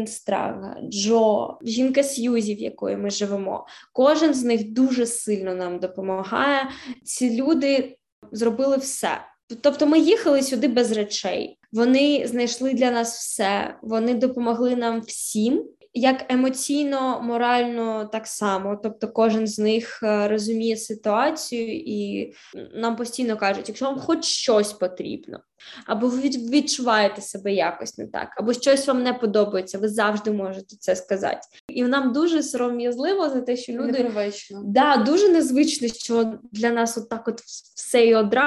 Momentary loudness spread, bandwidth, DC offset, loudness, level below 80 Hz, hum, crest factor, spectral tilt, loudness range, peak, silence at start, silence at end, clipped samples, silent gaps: 12 LU; 12.5 kHz; under 0.1%; -22 LUFS; -66 dBFS; none; 18 dB; -3.5 dB/octave; 3 LU; -4 dBFS; 0 s; 0 s; under 0.1%; 8.12-8.22 s, 9.43-9.48 s, 31.60-31.68 s